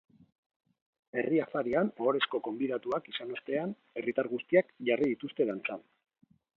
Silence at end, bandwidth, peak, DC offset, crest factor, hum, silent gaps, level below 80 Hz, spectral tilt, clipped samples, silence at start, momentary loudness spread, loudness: 0.8 s; 5.8 kHz; -12 dBFS; under 0.1%; 22 dB; none; none; -76 dBFS; -7.5 dB/octave; under 0.1%; 1.15 s; 10 LU; -32 LUFS